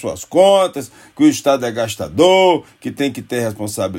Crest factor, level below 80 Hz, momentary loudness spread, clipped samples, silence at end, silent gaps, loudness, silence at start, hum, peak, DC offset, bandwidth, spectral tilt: 16 dB; -56 dBFS; 11 LU; under 0.1%; 0 s; none; -15 LUFS; 0 s; none; 0 dBFS; under 0.1%; 16.5 kHz; -4.5 dB/octave